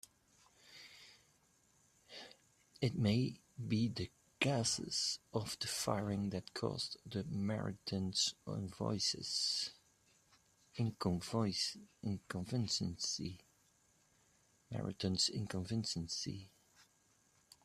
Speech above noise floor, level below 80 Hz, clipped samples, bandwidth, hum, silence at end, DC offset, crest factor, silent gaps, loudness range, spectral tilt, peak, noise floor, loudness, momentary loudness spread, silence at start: 35 dB; -70 dBFS; under 0.1%; 14.5 kHz; none; 0.8 s; under 0.1%; 24 dB; none; 4 LU; -4 dB/octave; -18 dBFS; -74 dBFS; -39 LUFS; 16 LU; 0.65 s